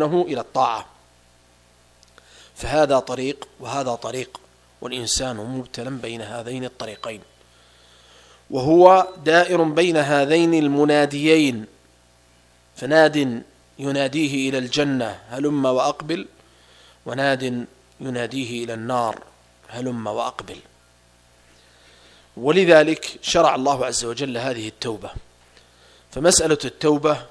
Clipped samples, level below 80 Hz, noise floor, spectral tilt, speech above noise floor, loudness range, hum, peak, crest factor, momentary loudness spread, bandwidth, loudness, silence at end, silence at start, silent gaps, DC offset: under 0.1%; -50 dBFS; -55 dBFS; -4 dB/octave; 35 dB; 11 LU; 60 Hz at -55 dBFS; 0 dBFS; 22 dB; 17 LU; 11 kHz; -20 LUFS; 0.05 s; 0 s; none; under 0.1%